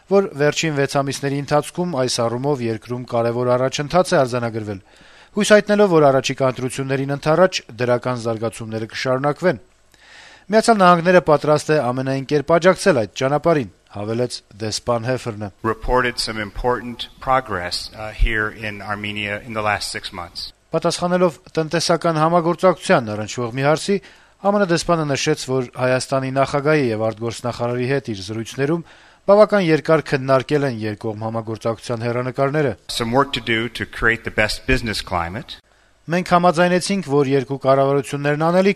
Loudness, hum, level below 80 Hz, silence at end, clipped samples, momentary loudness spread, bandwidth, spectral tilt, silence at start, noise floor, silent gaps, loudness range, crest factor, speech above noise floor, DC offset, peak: -19 LUFS; none; -38 dBFS; 0 s; under 0.1%; 11 LU; 13.5 kHz; -5 dB/octave; 0.1 s; -47 dBFS; none; 5 LU; 18 dB; 29 dB; under 0.1%; 0 dBFS